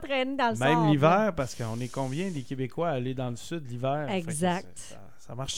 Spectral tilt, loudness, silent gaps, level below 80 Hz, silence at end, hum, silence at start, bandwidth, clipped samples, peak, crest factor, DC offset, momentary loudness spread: -5.5 dB/octave; -28 LUFS; none; -54 dBFS; 0 s; none; 0 s; 16 kHz; under 0.1%; -6 dBFS; 22 dB; 0.7%; 14 LU